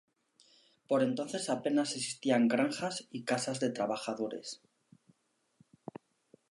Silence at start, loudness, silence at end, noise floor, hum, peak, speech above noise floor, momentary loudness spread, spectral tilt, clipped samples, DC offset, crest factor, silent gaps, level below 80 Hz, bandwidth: 0.9 s; -33 LUFS; 1.95 s; -74 dBFS; none; -16 dBFS; 41 dB; 21 LU; -4 dB/octave; under 0.1%; under 0.1%; 20 dB; none; -84 dBFS; 11.5 kHz